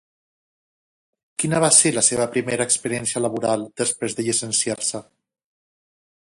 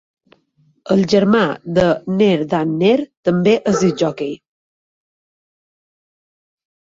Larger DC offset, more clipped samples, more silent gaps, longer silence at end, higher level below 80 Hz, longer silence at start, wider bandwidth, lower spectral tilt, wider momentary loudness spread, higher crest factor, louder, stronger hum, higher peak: neither; neither; second, none vs 3.17-3.23 s; second, 1.3 s vs 2.5 s; second, -62 dBFS vs -52 dBFS; first, 1.4 s vs 0.85 s; first, 11.5 kHz vs 7.8 kHz; second, -2.5 dB/octave vs -6.5 dB/octave; first, 11 LU vs 6 LU; first, 22 dB vs 16 dB; second, -19 LUFS vs -16 LUFS; neither; about the same, -2 dBFS vs -2 dBFS